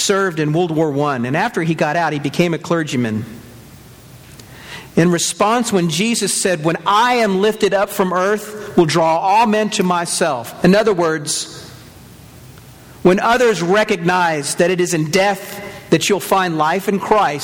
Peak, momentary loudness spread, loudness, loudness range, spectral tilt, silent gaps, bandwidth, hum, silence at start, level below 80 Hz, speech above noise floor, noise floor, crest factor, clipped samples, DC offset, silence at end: 0 dBFS; 7 LU; -16 LUFS; 4 LU; -4.5 dB/octave; none; 18.5 kHz; none; 0 s; -50 dBFS; 24 dB; -40 dBFS; 16 dB; under 0.1%; under 0.1%; 0 s